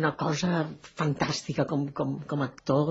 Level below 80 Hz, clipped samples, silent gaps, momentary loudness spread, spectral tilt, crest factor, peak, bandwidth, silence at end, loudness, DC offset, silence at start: -60 dBFS; under 0.1%; none; 5 LU; -6 dB/octave; 20 dB; -10 dBFS; 8.2 kHz; 0 s; -29 LUFS; under 0.1%; 0 s